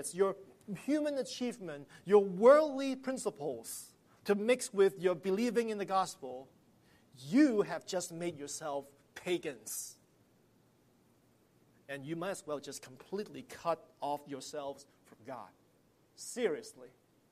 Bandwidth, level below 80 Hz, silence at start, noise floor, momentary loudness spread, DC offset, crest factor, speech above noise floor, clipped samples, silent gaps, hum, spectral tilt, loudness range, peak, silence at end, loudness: 15 kHz; -80 dBFS; 0 s; -69 dBFS; 18 LU; under 0.1%; 22 dB; 36 dB; under 0.1%; none; none; -4.5 dB/octave; 13 LU; -12 dBFS; 0.45 s; -34 LUFS